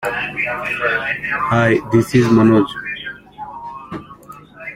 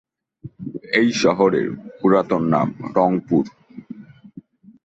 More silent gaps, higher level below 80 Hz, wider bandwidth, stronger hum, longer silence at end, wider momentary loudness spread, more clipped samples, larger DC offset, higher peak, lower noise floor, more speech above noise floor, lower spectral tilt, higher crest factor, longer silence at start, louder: neither; first, -48 dBFS vs -58 dBFS; first, 15.5 kHz vs 8.2 kHz; neither; second, 0 s vs 0.45 s; about the same, 20 LU vs 20 LU; neither; neither; about the same, -2 dBFS vs -2 dBFS; second, -39 dBFS vs -44 dBFS; about the same, 24 dB vs 26 dB; about the same, -7 dB/octave vs -6 dB/octave; about the same, 16 dB vs 18 dB; second, 0 s vs 0.45 s; first, -16 LUFS vs -19 LUFS